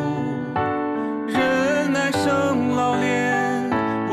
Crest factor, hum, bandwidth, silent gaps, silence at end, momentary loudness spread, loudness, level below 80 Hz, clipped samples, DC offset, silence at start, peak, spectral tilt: 10 dB; none; 14 kHz; none; 0 s; 5 LU; -21 LUFS; -58 dBFS; under 0.1%; under 0.1%; 0 s; -10 dBFS; -5.5 dB/octave